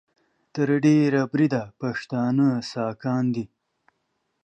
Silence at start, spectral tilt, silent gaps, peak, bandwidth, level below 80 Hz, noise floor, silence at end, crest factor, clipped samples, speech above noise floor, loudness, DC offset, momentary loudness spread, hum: 0.55 s; -7.5 dB/octave; none; -8 dBFS; 8.4 kHz; -68 dBFS; -75 dBFS; 1 s; 16 dB; under 0.1%; 52 dB; -23 LUFS; under 0.1%; 11 LU; none